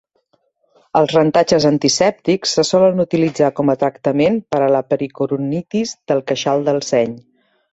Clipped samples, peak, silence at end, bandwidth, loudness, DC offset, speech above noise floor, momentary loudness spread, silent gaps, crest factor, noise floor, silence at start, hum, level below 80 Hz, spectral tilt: under 0.1%; -2 dBFS; 0.55 s; 8.2 kHz; -16 LUFS; under 0.1%; 47 dB; 7 LU; none; 16 dB; -63 dBFS; 0.95 s; none; -56 dBFS; -5 dB/octave